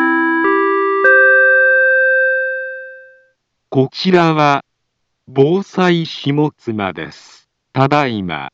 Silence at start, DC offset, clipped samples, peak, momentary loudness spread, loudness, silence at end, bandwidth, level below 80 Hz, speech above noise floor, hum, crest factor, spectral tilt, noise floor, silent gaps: 0 s; under 0.1%; under 0.1%; 0 dBFS; 14 LU; -13 LUFS; 0.05 s; 7.8 kHz; -60 dBFS; 55 dB; none; 14 dB; -6.5 dB/octave; -70 dBFS; none